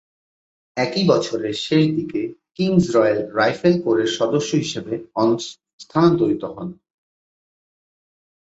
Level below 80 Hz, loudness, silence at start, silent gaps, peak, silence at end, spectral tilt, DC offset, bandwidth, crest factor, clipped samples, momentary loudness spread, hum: -58 dBFS; -20 LUFS; 0.75 s; 5.73-5.79 s; -2 dBFS; 1.8 s; -6 dB/octave; under 0.1%; 8 kHz; 18 dB; under 0.1%; 11 LU; none